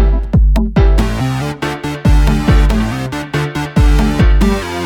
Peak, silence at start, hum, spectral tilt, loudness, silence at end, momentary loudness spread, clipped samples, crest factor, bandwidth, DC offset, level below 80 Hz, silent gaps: -2 dBFS; 0 s; none; -6.5 dB/octave; -14 LUFS; 0 s; 7 LU; under 0.1%; 10 dB; 12.5 kHz; under 0.1%; -14 dBFS; none